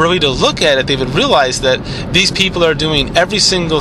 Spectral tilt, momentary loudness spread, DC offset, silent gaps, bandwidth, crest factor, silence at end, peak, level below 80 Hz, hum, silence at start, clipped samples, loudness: -3.5 dB/octave; 4 LU; under 0.1%; none; 14 kHz; 12 dB; 0 s; 0 dBFS; -30 dBFS; none; 0 s; under 0.1%; -12 LUFS